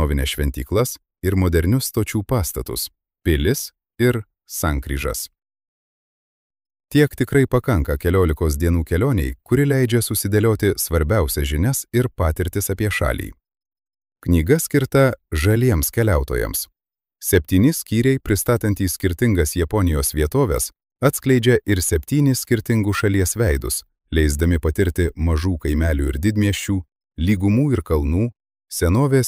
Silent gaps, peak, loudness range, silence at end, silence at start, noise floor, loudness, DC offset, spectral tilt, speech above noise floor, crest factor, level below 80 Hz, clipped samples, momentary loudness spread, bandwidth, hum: 5.68-6.50 s; -4 dBFS; 4 LU; 0 s; 0 s; -83 dBFS; -20 LUFS; under 0.1%; -5.5 dB/octave; 65 dB; 16 dB; -28 dBFS; under 0.1%; 8 LU; 16 kHz; none